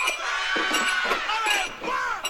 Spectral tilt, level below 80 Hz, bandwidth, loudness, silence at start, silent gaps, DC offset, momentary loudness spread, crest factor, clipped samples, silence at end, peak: 0 dB/octave; -52 dBFS; 16.5 kHz; -24 LUFS; 0 s; none; under 0.1%; 5 LU; 16 dB; under 0.1%; 0 s; -10 dBFS